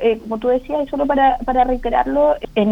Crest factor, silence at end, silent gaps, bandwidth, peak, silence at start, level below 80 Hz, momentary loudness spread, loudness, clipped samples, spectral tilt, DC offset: 14 dB; 0 s; none; 7.4 kHz; -4 dBFS; 0 s; -34 dBFS; 5 LU; -17 LUFS; under 0.1%; -7.5 dB/octave; under 0.1%